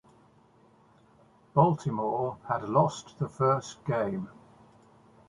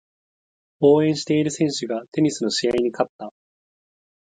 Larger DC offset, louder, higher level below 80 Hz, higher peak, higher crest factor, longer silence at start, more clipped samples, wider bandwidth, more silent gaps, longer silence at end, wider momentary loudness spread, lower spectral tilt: neither; second, -29 LUFS vs -21 LUFS; about the same, -64 dBFS vs -62 dBFS; second, -8 dBFS vs -4 dBFS; first, 24 dB vs 18 dB; first, 1.55 s vs 0.8 s; neither; first, 11 kHz vs 9.4 kHz; second, none vs 2.08-2.12 s, 3.09-3.19 s; about the same, 0.95 s vs 1.05 s; about the same, 11 LU vs 10 LU; first, -7.5 dB/octave vs -5 dB/octave